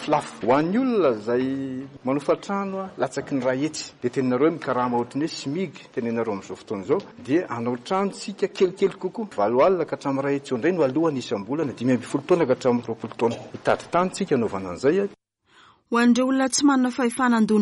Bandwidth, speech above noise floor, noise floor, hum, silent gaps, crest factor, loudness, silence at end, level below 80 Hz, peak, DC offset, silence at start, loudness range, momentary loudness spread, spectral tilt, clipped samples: 11.5 kHz; 33 dB; -56 dBFS; none; none; 16 dB; -24 LUFS; 0 s; -64 dBFS; -8 dBFS; under 0.1%; 0 s; 4 LU; 9 LU; -5.5 dB/octave; under 0.1%